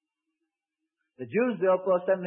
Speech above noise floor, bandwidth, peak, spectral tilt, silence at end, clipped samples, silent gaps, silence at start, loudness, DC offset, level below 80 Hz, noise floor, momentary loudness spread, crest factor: 61 dB; 3.5 kHz; -12 dBFS; -10.5 dB/octave; 0 s; under 0.1%; none; 1.2 s; -26 LUFS; under 0.1%; -82 dBFS; -87 dBFS; 8 LU; 16 dB